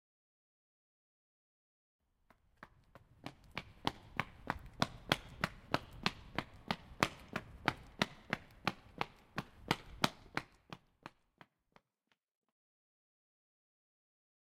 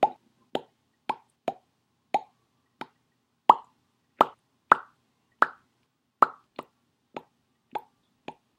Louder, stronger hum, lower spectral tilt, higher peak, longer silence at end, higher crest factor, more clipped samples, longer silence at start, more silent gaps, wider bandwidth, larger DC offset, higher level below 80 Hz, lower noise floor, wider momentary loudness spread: second, -41 LUFS vs -27 LUFS; neither; about the same, -4 dB/octave vs -4.5 dB/octave; second, -10 dBFS vs 0 dBFS; first, 3.45 s vs 0.8 s; about the same, 34 dB vs 30 dB; neither; first, 2.6 s vs 0 s; neither; about the same, 16 kHz vs 15.5 kHz; neither; first, -62 dBFS vs -78 dBFS; first, -83 dBFS vs -74 dBFS; second, 19 LU vs 22 LU